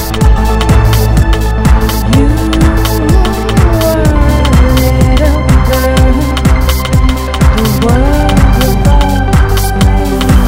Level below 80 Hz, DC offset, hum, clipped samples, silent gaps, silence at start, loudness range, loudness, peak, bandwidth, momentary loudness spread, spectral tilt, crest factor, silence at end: -10 dBFS; under 0.1%; none; 1%; none; 0 s; 1 LU; -9 LUFS; 0 dBFS; 16.5 kHz; 2 LU; -6 dB/octave; 8 dB; 0 s